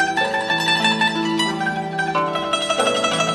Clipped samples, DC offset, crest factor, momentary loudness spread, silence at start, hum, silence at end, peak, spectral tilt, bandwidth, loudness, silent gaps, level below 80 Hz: under 0.1%; under 0.1%; 16 dB; 5 LU; 0 s; none; 0 s; -4 dBFS; -3 dB/octave; 14 kHz; -19 LUFS; none; -56 dBFS